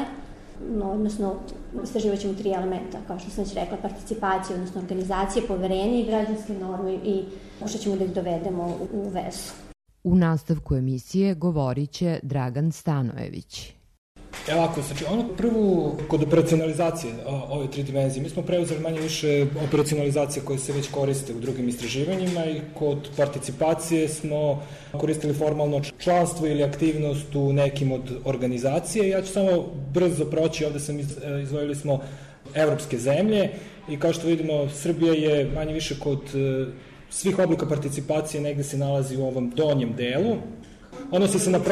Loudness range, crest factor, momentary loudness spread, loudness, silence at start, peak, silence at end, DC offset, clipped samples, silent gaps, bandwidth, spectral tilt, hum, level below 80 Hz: 4 LU; 16 dB; 10 LU; -25 LUFS; 0 s; -10 dBFS; 0 s; under 0.1%; under 0.1%; 13.98-14.15 s; 13.5 kHz; -6 dB/octave; none; -46 dBFS